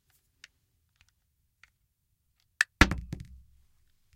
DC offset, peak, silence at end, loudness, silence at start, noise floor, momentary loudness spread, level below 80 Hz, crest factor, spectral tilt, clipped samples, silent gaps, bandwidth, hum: under 0.1%; -4 dBFS; 0.95 s; -27 LUFS; 2.6 s; -76 dBFS; 22 LU; -42 dBFS; 32 dB; -4 dB/octave; under 0.1%; none; 16 kHz; none